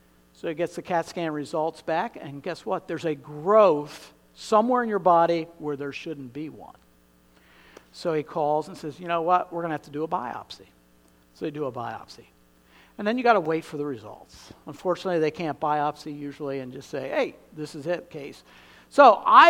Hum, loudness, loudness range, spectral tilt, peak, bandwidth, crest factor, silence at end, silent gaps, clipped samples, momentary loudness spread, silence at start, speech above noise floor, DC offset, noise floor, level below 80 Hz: none; -25 LUFS; 9 LU; -5.5 dB/octave; -2 dBFS; 16 kHz; 24 dB; 0 s; none; under 0.1%; 19 LU; 0.45 s; 34 dB; under 0.1%; -59 dBFS; -66 dBFS